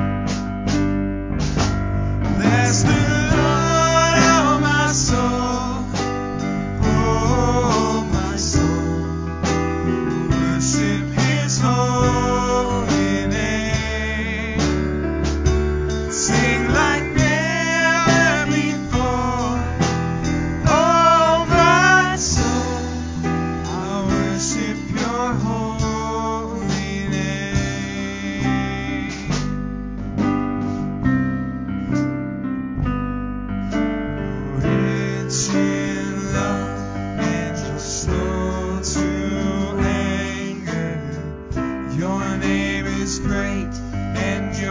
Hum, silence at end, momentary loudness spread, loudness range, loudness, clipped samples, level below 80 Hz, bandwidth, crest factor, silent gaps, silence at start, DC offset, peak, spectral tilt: none; 0 s; 10 LU; 7 LU; -20 LUFS; under 0.1%; -30 dBFS; 7.6 kHz; 18 dB; none; 0 s; under 0.1%; -2 dBFS; -5 dB/octave